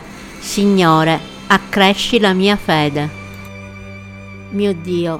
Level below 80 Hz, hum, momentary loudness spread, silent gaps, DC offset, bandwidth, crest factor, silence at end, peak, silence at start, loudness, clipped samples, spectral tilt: -42 dBFS; none; 21 LU; none; under 0.1%; 16.5 kHz; 16 dB; 0 s; 0 dBFS; 0 s; -15 LUFS; under 0.1%; -5 dB/octave